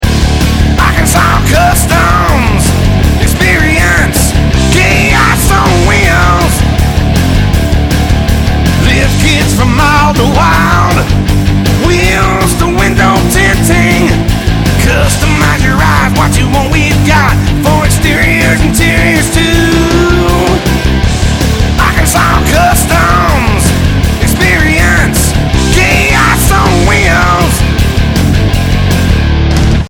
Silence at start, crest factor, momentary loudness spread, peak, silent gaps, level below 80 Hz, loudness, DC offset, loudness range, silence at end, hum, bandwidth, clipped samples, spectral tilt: 0 s; 8 dB; 3 LU; 0 dBFS; none; -12 dBFS; -8 LUFS; under 0.1%; 1 LU; 0 s; none; 19 kHz; 1%; -5 dB/octave